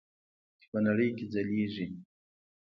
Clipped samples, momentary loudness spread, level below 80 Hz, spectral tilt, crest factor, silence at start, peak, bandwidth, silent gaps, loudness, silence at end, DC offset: under 0.1%; 12 LU; -68 dBFS; -9 dB/octave; 18 dB; 0.75 s; -16 dBFS; 6 kHz; none; -32 LUFS; 0.6 s; under 0.1%